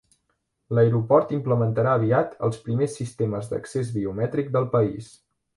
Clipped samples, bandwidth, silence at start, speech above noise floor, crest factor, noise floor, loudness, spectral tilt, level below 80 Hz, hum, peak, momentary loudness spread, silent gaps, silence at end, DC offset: under 0.1%; 11.5 kHz; 0.7 s; 51 dB; 18 dB; -74 dBFS; -24 LUFS; -8 dB/octave; -58 dBFS; none; -6 dBFS; 8 LU; none; 0.5 s; under 0.1%